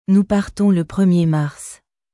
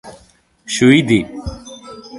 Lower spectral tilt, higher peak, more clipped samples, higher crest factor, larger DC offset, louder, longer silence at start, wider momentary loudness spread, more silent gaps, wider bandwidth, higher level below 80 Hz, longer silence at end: first, -7.5 dB/octave vs -5 dB/octave; second, -6 dBFS vs 0 dBFS; neither; second, 12 dB vs 18 dB; neither; second, -17 LUFS vs -13 LUFS; about the same, 0.1 s vs 0.05 s; second, 14 LU vs 23 LU; neither; about the same, 12 kHz vs 11.5 kHz; second, -46 dBFS vs -40 dBFS; first, 0.4 s vs 0 s